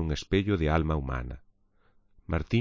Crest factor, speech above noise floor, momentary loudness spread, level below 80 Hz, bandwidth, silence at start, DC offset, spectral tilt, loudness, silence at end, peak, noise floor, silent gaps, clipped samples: 18 dB; 37 dB; 13 LU; -38 dBFS; 7.6 kHz; 0 s; under 0.1%; -7 dB/octave; -29 LUFS; 0 s; -12 dBFS; -64 dBFS; none; under 0.1%